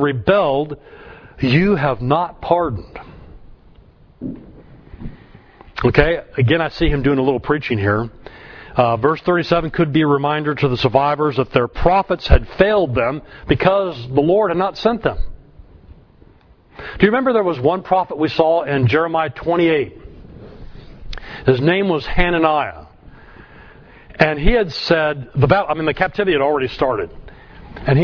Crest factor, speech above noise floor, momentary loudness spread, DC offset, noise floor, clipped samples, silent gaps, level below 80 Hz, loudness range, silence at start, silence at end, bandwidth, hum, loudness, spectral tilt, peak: 18 dB; 32 dB; 16 LU; under 0.1%; -48 dBFS; under 0.1%; none; -30 dBFS; 4 LU; 0 s; 0 s; 5.4 kHz; none; -17 LUFS; -8 dB/octave; 0 dBFS